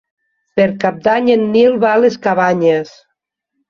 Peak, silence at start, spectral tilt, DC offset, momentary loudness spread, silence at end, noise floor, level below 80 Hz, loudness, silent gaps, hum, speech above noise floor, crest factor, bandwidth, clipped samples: -2 dBFS; 0.55 s; -6.5 dB/octave; under 0.1%; 6 LU; 0.8 s; -73 dBFS; -56 dBFS; -13 LUFS; none; none; 61 dB; 14 dB; 7 kHz; under 0.1%